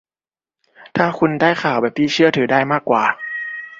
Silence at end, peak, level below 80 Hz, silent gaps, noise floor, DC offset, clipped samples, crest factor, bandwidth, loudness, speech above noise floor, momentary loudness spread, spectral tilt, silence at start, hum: 0.05 s; 0 dBFS; -60 dBFS; none; under -90 dBFS; under 0.1%; under 0.1%; 18 dB; 7.6 kHz; -17 LUFS; over 74 dB; 10 LU; -5.5 dB/octave; 0.8 s; none